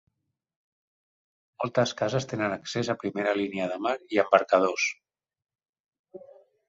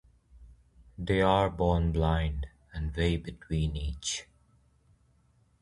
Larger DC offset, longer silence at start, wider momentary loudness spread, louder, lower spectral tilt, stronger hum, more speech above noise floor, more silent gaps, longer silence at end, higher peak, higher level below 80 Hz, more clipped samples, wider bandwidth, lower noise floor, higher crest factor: neither; first, 1.6 s vs 0.35 s; second, 8 LU vs 12 LU; first, -27 LUFS vs -30 LUFS; about the same, -4.5 dB/octave vs -5.5 dB/octave; neither; second, 27 dB vs 38 dB; first, 5.69-5.73 s, 5.80-5.92 s, 5.99-6.04 s vs none; second, 0.5 s vs 1.4 s; first, -4 dBFS vs -10 dBFS; second, -68 dBFS vs -38 dBFS; neither; second, 8 kHz vs 11.5 kHz; second, -53 dBFS vs -66 dBFS; about the same, 24 dB vs 20 dB